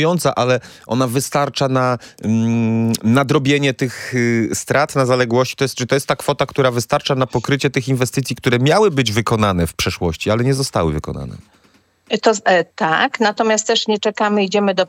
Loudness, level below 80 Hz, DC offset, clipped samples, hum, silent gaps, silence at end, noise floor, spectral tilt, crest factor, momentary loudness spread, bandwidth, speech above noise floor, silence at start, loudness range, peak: -17 LUFS; -46 dBFS; under 0.1%; under 0.1%; none; none; 0 s; -55 dBFS; -5 dB/octave; 16 dB; 5 LU; 17 kHz; 38 dB; 0 s; 2 LU; 0 dBFS